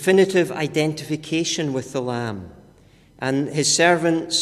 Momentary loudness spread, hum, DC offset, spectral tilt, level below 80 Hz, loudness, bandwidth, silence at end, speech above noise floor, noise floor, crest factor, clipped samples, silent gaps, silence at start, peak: 12 LU; none; under 0.1%; -4 dB/octave; -56 dBFS; -21 LUFS; 14 kHz; 0 s; 31 dB; -52 dBFS; 18 dB; under 0.1%; none; 0 s; -4 dBFS